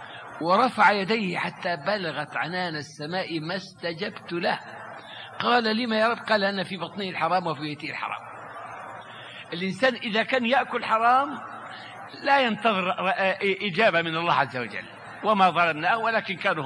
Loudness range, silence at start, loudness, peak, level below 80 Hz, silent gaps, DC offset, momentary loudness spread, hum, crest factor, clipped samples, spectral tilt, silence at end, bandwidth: 6 LU; 0 s; -25 LUFS; -6 dBFS; -74 dBFS; none; under 0.1%; 18 LU; none; 20 dB; under 0.1%; -5 dB/octave; 0 s; 11 kHz